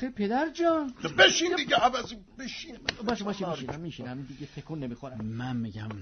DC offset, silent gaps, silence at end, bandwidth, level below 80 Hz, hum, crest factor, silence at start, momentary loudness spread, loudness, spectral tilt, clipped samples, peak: under 0.1%; none; 0 s; 6.6 kHz; -56 dBFS; none; 24 dB; 0 s; 19 LU; -28 LUFS; -3.5 dB/octave; under 0.1%; -6 dBFS